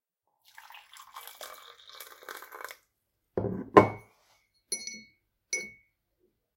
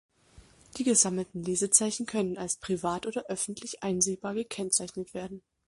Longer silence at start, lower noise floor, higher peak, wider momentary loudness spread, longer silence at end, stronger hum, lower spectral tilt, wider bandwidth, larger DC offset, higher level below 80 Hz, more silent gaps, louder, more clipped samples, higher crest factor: first, 1.15 s vs 0.35 s; first, -79 dBFS vs -57 dBFS; first, -2 dBFS vs -6 dBFS; first, 27 LU vs 15 LU; first, 0.85 s vs 0.3 s; neither; first, -4.5 dB/octave vs -3 dB/octave; first, 17 kHz vs 11.5 kHz; neither; about the same, -64 dBFS vs -64 dBFS; neither; about the same, -28 LUFS vs -29 LUFS; neither; first, 32 dB vs 26 dB